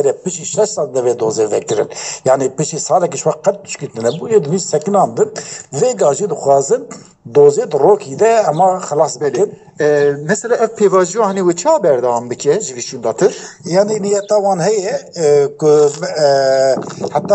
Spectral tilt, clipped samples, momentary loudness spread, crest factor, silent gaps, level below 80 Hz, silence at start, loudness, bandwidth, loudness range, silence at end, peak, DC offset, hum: -4.5 dB/octave; under 0.1%; 8 LU; 14 dB; none; -62 dBFS; 0 s; -14 LUFS; 8.8 kHz; 3 LU; 0 s; 0 dBFS; under 0.1%; none